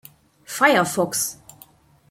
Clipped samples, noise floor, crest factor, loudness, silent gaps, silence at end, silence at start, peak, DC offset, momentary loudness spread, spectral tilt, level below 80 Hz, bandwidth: under 0.1%; -52 dBFS; 22 dB; -20 LUFS; none; 0.75 s; 0.5 s; -2 dBFS; under 0.1%; 16 LU; -3 dB/octave; -64 dBFS; 16.5 kHz